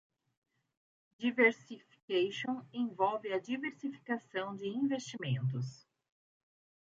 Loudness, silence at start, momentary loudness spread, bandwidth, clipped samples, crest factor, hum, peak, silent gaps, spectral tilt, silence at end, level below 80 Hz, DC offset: -35 LUFS; 1.2 s; 13 LU; 7.8 kHz; under 0.1%; 22 dB; none; -16 dBFS; 2.03-2.08 s; -6 dB/octave; 1.15 s; -82 dBFS; under 0.1%